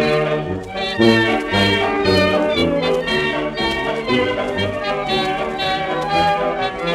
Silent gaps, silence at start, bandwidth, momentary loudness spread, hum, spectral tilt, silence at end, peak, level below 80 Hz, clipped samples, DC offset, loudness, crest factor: none; 0 s; 15 kHz; 6 LU; none; -5.5 dB/octave; 0 s; 0 dBFS; -42 dBFS; under 0.1%; under 0.1%; -18 LUFS; 18 dB